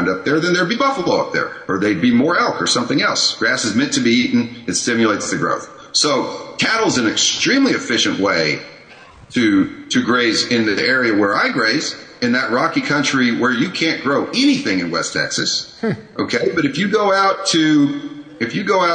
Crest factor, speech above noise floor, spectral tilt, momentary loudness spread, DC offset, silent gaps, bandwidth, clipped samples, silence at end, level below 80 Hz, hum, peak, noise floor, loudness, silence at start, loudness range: 14 dB; 25 dB; -3.5 dB/octave; 7 LU; under 0.1%; none; 9.6 kHz; under 0.1%; 0 s; -56 dBFS; none; -4 dBFS; -42 dBFS; -16 LUFS; 0 s; 1 LU